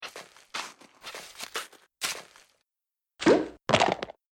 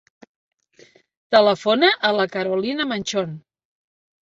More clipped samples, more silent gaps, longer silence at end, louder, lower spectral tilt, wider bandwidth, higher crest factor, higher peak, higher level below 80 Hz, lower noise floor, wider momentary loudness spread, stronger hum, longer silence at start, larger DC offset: neither; neither; second, 0.2 s vs 0.85 s; second, -28 LUFS vs -19 LUFS; about the same, -3.5 dB/octave vs -4 dB/octave; first, 17 kHz vs 8 kHz; about the same, 24 dB vs 20 dB; second, -6 dBFS vs -2 dBFS; about the same, -64 dBFS vs -66 dBFS; first, -89 dBFS vs -53 dBFS; first, 19 LU vs 10 LU; neither; second, 0 s vs 1.3 s; neither